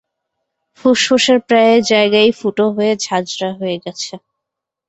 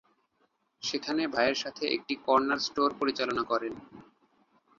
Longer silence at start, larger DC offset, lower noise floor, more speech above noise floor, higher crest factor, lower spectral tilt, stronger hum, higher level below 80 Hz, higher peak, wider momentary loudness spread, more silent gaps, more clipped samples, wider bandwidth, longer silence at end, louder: about the same, 0.85 s vs 0.8 s; neither; first, -81 dBFS vs -73 dBFS; first, 67 dB vs 44 dB; second, 14 dB vs 22 dB; about the same, -3.5 dB/octave vs -3 dB/octave; neither; first, -58 dBFS vs -68 dBFS; first, -2 dBFS vs -10 dBFS; first, 12 LU vs 8 LU; neither; neither; about the same, 8.2 kHz vs 7.6 kHz; about the same, 0.7 s vs 0.75 s; first, -14 LUFS vs -29 LUFS